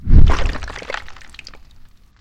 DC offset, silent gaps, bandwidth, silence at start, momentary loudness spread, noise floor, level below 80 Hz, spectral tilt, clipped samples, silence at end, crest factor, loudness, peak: under 0.1%; none; 7.6 kHz; 0.05 s; 23 LU; -43 dBFS; -16 dBFS; -6.5 dB/octave; 0.3%; 1.1 s; 14 dB; -20 LUFS; 0 dBFS